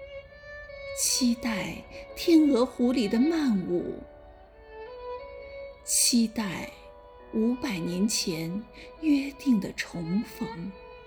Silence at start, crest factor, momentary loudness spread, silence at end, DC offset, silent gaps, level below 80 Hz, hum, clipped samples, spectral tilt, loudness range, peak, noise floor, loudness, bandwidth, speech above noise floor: 0 s; 18 dB; 20 LU; 0 s; under 0.1%; none; -54 dBFS; none; under 0.1%; -3.5 dB/octave; 4 LU; -10 dBFS; -50 dBFS; -27 LUFS; over 20 kHz; 24 dB